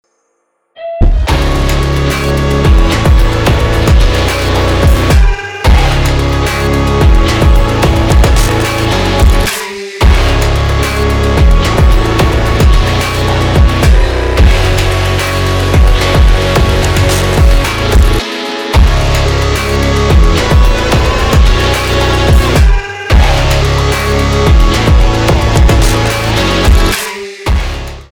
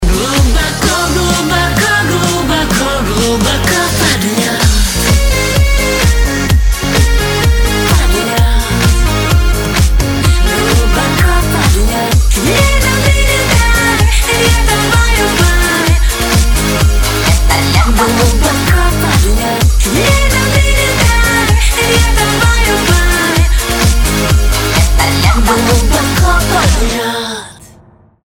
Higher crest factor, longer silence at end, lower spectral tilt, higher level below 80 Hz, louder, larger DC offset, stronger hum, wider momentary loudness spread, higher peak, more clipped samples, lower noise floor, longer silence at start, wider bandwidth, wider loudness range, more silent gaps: about the same, 8 dB vs 10 dB; second, 0.1 s vs 0.75 s; first, -5.5 dB/octave vs -4 dB/octave; about the same, -10 dBFS vs -12 dBFS; about the same, -10 LUFS vs -10 LUFS; neither; neither; about the same, 3 LU vs 2 LU; about the same, 0 dBFS vs 0 dBFS; neither; first, -61 dBFS vs -42 dBFS; first, 0.8 s vs 0 s; about the same, 19 kHz vs 19.5 kHz; about the same, 1 LU vs 2 LU; neither